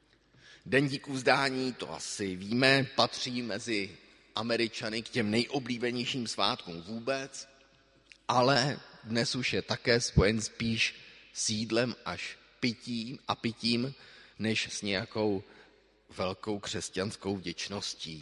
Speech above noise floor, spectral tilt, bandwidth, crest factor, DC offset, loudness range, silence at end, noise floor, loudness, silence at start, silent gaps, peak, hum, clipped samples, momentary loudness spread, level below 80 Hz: 32 dB; -4 dB/octave; 11.5 kHz; 26 dB; under 0.1%; 5 LU; 0 s; -63 dBFS; -31 LUFS; 0.45 s; none; -6 dBFS; none; under 0.1%; 12 LU; -52 dBFS